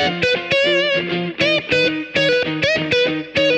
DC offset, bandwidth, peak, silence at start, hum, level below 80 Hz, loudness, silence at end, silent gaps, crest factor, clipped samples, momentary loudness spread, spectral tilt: under 0.1%; 9.4 kHz; -4 dBFS; 0 s; none; -52 dBFS; -17 LUFS; 0 s; none; 14 dB; under 0.1%; 3 LU; -4.5 dB/octave